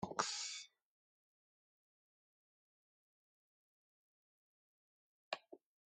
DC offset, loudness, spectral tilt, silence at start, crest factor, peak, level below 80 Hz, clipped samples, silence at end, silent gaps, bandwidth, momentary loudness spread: under 0.1%; -44 LUFS; -1.5 dB/octave; 0 s; 32 dB; -20 dBFS; -88 dBFS; under 0.1%; 0.35 s; 0.85-5.31 s; 11.5 kHz; 23 LU